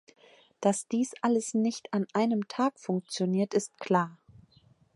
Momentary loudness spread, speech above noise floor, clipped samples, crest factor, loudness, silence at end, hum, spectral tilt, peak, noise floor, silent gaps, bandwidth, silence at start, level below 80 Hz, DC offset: 5 LU; 34 dB; under 0.1%; 20 dB; -30 LUFS; 0.8 s; none; -5.5 dB/octave; -10 dBFS; -63 dBFS; none; 11.5 kHz; 0.6 s; -76 dBFS; under 0.1%